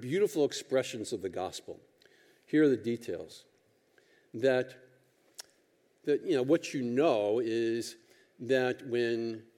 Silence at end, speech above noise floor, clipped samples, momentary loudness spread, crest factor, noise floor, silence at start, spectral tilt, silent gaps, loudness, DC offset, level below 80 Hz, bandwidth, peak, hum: 0.15 s; 39 dB; under 0.1%; 19 LU; 18 dB; -70 dBFS; 0 s; -5 dB/octave; none; -31 LUFS; under 0.1%; -84 dBFS; 16.5 kHz; -14 dBFS; none